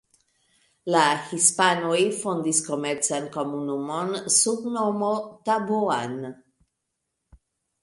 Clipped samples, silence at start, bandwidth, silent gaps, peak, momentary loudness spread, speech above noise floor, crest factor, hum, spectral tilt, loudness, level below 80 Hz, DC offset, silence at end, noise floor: under 0.1%; 0.85 s; 11.5 kHz; none; -6 dBFS; 10 LU; 56 dB; 20 dB; none; -2.5 dB/octave; -23 LUFS; -68 dBFS; under 0.1%; 1.5 s; -80 dBFS